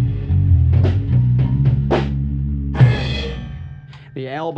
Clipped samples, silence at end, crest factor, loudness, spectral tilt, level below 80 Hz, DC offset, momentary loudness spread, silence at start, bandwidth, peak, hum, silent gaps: under 0.1%; 0 s; 16 dB; -17 LUFS; -8.5 dB/octave; -26 dBFS; under 0.1%; 17 LU; 0 s; 6 kHz; 0 dBFS; none; none